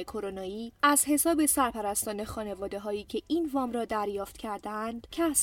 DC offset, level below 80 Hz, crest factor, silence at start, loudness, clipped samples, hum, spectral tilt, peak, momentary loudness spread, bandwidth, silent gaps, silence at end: under 0.1%; -56 dBFS; 18 dB; 0 s; -29 LUFS; under 0.1%; none; -2.5 dB/octave; -10 dBFS; 13 LU; 17.5 kHz; none; 0 s